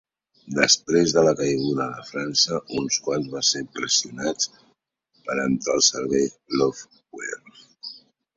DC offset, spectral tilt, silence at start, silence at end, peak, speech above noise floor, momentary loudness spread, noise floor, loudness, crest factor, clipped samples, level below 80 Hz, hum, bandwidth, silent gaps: under 0.1%; -2.5 dB/octave; 0.45 s; 0.4 s; -2 dBFS; 44 dB; 19 LU; -67 dBFS; -22 LUFS; 22 dB; under 0.1%; -60 dBFS; none; 7.8 kHz; none